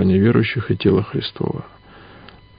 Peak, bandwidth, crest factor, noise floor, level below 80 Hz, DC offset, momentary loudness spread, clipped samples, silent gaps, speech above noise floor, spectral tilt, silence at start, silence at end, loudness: -2 dBFS; 5.2 kHz; 16 dB; -43 dBFS; -40 dBFS; under 0.1%; 11 LU; under 0.1%; none; 25 dB; -12.5 dB/octave; 0 s; 0.9 s; -19 LUFS